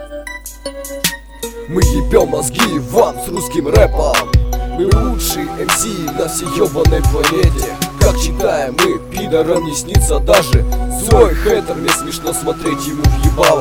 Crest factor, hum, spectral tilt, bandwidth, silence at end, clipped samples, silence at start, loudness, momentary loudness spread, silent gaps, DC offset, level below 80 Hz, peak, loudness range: 14 dB; none; -4.5 dB/octave; 19 kHz; 0 s; under 0.1%; 0 s; -14 LUFS; 9 LU; none; under 0.1%; -20 dBFS; 0 dBFS; 2 LU